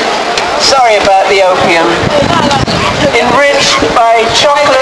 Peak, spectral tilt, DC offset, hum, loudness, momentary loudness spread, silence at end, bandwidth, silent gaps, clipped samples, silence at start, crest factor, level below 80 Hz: 0 dBFS; -3 dB/octave; under 0.1%; none; -7 LUFS; 3 LU; 0 s; 11 kHz; none; 0.5%; 0 s; 8 dB; -32 dBFS